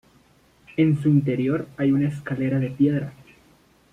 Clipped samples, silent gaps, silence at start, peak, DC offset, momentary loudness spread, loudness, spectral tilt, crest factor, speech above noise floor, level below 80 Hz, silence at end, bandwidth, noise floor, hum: under 0.1%; none; 0.75 s; -8 dBFS; under 0.1%; 8 LU; -23 LUFS; -9.5 dB/octave; 16 dB; 36 dB; -58 dBFS; 0.8 s; 9.6 kHz; -57 dBFS; none